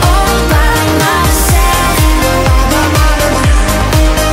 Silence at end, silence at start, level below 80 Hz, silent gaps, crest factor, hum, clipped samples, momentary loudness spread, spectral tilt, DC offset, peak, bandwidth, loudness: 0 s; 0 s; -12 dBFS; none; 8 dB; none; under 0.1%; 1 LU; -4.5 dB/octave; under 0.1%; 0 dBFS; 16.5 kHz; -10 LUFS